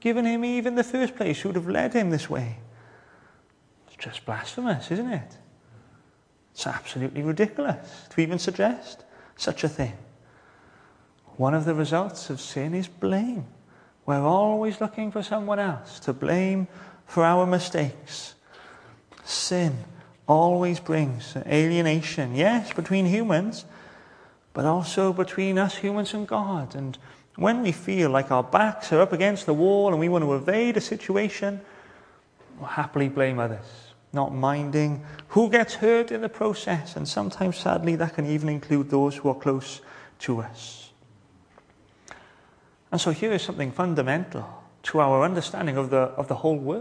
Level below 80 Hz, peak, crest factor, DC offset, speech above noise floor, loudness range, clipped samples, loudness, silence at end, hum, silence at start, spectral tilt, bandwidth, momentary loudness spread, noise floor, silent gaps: -64 dBFS; -4 dBFS; 22 dB; under 0.1%; 37 dB; 8 LU; under 0.1%; -25 LUFS; 0 s; none; 0.05 s; -6 dB/octave; 10.5 kHz; 14 LU; -61 dBFS; none